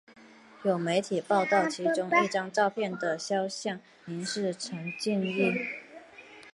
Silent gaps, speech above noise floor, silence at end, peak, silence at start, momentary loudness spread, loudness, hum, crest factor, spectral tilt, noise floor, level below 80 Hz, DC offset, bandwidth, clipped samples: none; 22 dB; 0.05 s; -10 dBFS; 0.1 s; 15 LU; -29 LUFS; none; 20 dB; -4.5 dB/octave; -51 dBFS; -76 dBFS; under 0.1%; 11.5 kHz; under 0.1%